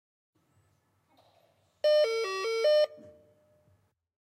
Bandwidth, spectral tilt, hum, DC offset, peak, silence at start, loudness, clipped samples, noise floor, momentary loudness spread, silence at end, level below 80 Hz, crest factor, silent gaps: 14.5 kHz; -1.5 dB/octave; none; under 0.1%; -18 dBFS; 1.85 s; -27 LUFS; under 0.1%; -71 dBFS; 6 LU; 1.15 s; -86 dBFS; 14 dB; none